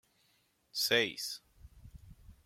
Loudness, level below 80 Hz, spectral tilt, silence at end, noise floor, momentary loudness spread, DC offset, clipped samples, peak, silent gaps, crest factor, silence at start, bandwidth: -32 LUFS; -62 dBFS; -1.5 dB/octave; 0.15 s; -73 dBFS; 13 LU; under 0.1%; under 0.1%; -14 dBFS; none; 24 dB; 0.75 s; 16.5 kHz